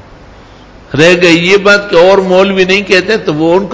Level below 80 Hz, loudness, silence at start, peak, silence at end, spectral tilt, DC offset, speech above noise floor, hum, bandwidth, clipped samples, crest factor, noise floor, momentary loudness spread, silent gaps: -40 dBFS; -7 LUFS; 0.9 s; 0 dBFS; 0 s; -5 dB/octave; under 0.1%; 27 dB; none; 8 kHz; 3%; 8 dB; -34 dBFS; 5 LU; none